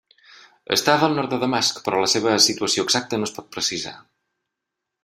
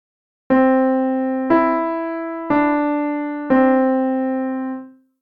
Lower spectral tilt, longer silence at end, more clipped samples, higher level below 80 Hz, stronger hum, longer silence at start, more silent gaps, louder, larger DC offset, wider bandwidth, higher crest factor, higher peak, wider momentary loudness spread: second, -2.5 dB/octave vs -9 dB/octave; first, 1.05 s vs 0.3 s; neither; second, -64 dBFS vs -56 dBFS; neither; first, 0.7 s vs 0.5 s; neither; about the same, -20 LUFS vs -18 LUFS; neither; first, 16 kHz vs 4.7 kHz; first, 22 dB vs 14 dB; about the same, -2 dBFS vs -4 dBFS; about the same, 10 LU vs 10 LU